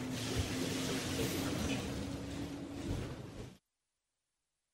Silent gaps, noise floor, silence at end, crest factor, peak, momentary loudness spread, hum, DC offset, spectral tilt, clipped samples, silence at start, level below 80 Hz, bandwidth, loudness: none; -89 dBFS; 1.15 s; 16 dB; -24 dBFS; 10 LU; none; under 0.1%; -4.5 dB/octave; under 0.1%; 0 s; -52 dBFS; 16 kHz; -39 LUFS